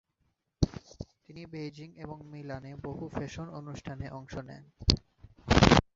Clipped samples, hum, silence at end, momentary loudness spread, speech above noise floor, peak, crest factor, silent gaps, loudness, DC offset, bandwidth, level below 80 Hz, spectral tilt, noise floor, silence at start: under 0.1%; none; 0.15 s; 21 LU; 40 dB; -2 dBFS; 30 dB; none; -31 LUFS; under 0.1%; 8 kHz; -42 dBFS; -5.5 dB/octave; -77 dBFS; 0.6 s